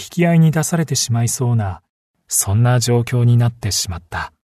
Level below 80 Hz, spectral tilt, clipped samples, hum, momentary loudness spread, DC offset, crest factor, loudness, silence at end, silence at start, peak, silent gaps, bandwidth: -44 dBFS; -5 dB/octave; under 0.1%; none; 10 LU; under 0.1%; 14 dB; -16 LUFS; 0.15 s; 0 s; -4 dBFS; 1.89-2.14 s; 13.5 kHz